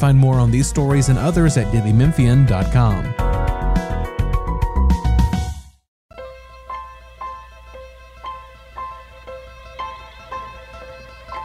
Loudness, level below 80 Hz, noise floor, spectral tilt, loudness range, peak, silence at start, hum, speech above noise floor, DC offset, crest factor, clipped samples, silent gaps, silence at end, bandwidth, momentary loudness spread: -17 LUFS; -24 dBFS; -39 dBFS; -7 dB/octave; 19 LU; -4 dBFS; 0 s; none; 25 dB; under 0.1%; 16 dB; under 0.1%; 5.88-6.09 s; 0 s; 13 kHz; 23 LU